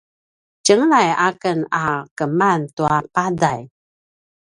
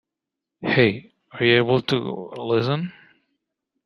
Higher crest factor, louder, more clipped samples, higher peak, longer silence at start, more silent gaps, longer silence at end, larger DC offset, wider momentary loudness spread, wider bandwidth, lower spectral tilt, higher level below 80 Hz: about the same, 18 dB vs 22 dB; first, -18 LUFS vs -21 LUFS; neither; about the same, 0 dBFS vs -2 dBFS; about the same, 0.65 s vs 0.6 s; first, 2.11-2.16 s, 2.73-2.77 s vs none; about the same, 0.9 s vs 0.95 s; neither; second, 8 LU vs 15 LU; about the same, 11.5 kHz vs 10.5 kHz; second, -4.5 dB/octave vs -7 dB/octave; about the same, -56 dBFS vs -60 dBFS